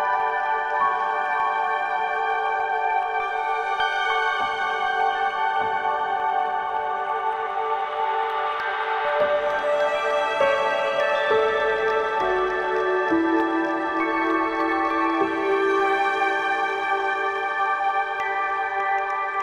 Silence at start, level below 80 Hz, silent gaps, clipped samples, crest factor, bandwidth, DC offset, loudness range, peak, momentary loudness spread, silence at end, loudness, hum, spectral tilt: 0 s; -58 dBFS; none; under 0.1%; 14 dB; 10.5 kHz; under 0.1%; 2 LU; -8 dBFS; 4 LU; 0 s; -23 LUFS; none; -3.5 dB/octave